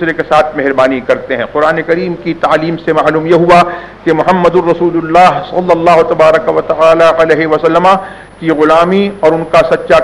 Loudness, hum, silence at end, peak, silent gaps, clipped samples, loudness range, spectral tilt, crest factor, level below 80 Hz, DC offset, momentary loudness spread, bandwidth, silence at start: -9 LUFS; none; 0 s; 0 dBFS; none; 1%; 2 LU; -6.5 dB/octave; 8 dB; -40 dBFS; under 0.1%; 7 LU; 11.5 kHz; 0 s